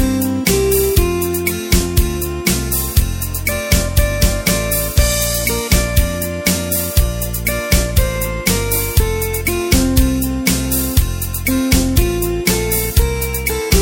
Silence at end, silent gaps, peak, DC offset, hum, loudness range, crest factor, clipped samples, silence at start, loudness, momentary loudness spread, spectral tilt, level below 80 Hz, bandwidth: 0 s; none; 0 dBFS; under 0.1%; none; 1 LU; 16 dB; under 0.1%; 0 s; -16 LUFS; 5 LU; -4 dB/octave; -20 dBFS; 17 kHz